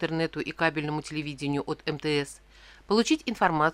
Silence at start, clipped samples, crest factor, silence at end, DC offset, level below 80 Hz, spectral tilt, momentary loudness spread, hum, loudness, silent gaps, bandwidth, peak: 0 s; under 0.1%; 20 dB; 0 s; under 0.1%; -56 dBFS; -5 dB/octave; 8 LU; none; -28 LUFS; none; 13.5 kHz; -8 dBFS